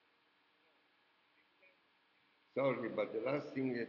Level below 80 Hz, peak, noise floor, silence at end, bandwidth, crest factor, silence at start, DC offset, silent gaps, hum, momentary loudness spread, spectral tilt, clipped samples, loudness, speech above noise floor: under -90 dBFS; -24 dBFS; -75 dBFS; 0 s; 6 kHz; 18 dB; 2.55 s; under 0.1%; none; none; 3 LU; -5.5 dB/octave; under 0.1%; -39 LUFS; 37 dB